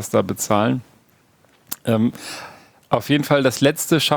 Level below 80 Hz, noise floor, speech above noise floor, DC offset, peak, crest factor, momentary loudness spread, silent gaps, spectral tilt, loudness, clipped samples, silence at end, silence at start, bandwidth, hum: -58 dBFS; -57 dBFS; 38 dB; under 0.1%; -2 dBFS; 20 dB; 16 LU; none; -4.5 dB/octave; -19 LUFS; under 0.1%; 0 s; 0 s; over 20 kHz; none